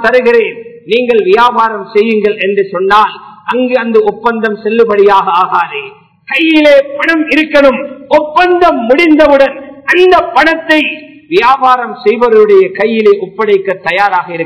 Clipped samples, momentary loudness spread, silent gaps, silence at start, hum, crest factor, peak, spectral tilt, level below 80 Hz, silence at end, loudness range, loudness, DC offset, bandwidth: 4%; 8 LU; none; 0 s; none; 8 dB; 0 dBFS; -6 dB/octave; -44 dBFS; 0 s; 3 LU; -8 LUFS; 0.2%; 5.4 kHz